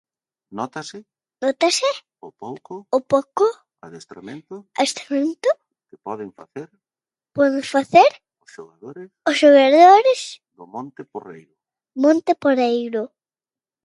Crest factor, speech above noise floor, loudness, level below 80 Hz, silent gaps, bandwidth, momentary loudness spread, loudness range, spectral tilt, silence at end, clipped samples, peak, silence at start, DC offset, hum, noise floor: 20 dB; over 71 dB; -17 LUFS; -72 dBFS; none; 11.5 kHz; 25 LU; 9 LU; -3.5 dB/octave; 0.8 s; under 0.1%; 0 dBFS; 0.55 s; under 0.1%; none; under -90 dBFS